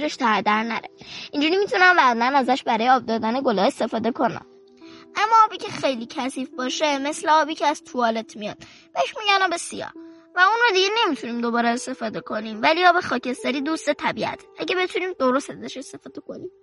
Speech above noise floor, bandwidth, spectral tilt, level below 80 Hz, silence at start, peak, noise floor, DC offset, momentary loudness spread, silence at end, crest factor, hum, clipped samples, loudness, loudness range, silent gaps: 24 dB; 11.5 kHz; -3 dB/octave; -68 dBFS; 0 s; -4 dBFS; -46 dBFS; under 0.1%; 17 LU; 0.15 s; 18 dB; none; under 0.1%; -21 LUFS; 4 LU; none